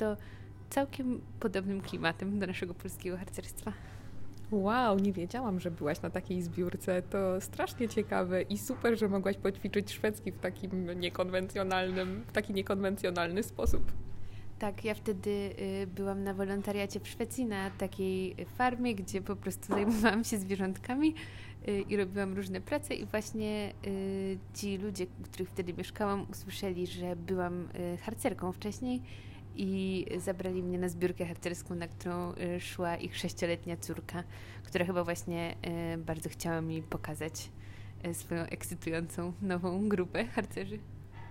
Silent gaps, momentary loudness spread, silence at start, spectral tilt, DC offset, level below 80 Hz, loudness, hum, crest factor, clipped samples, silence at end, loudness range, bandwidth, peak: none; 9 LU; 0 s; -5.5 dB/octave; under 0.1%; -52 dBFS; -35 LUFS; none; 20 dB; under 0.1%; 0 s; 4 LU; 16 kHz; -14 dBFS